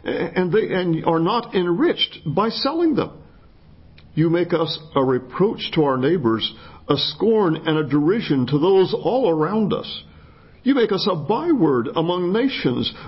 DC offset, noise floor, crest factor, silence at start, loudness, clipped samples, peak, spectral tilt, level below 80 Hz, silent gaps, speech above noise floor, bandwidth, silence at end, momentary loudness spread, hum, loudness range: under 0.1%; -47 dBFS; 16 dB; 0.05 s; -20 LUFS; under 0.1%; -4 dBFS; -10.5 dB/octave; -52 dBFS; none; 28 dB; 5.8 kHz; 0 s; 5 LU; none; 3 LU